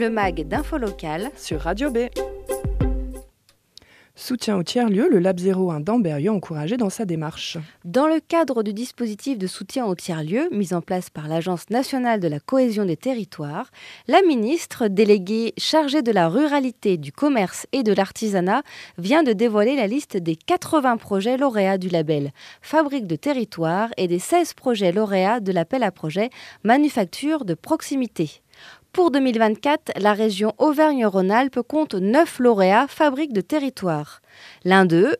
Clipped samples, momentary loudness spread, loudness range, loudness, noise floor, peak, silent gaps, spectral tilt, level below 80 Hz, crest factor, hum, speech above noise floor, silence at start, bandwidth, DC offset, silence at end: under 0.1%; 10 LU; 5 LU; -21 LUFS; -60 dBFS; -2 dBFS; none; -5.5 dB/octave; -42 dBFS; 20 dB; none; 39 dB; 0 s; 14.5 kHz; under 0.1%; 0.05 s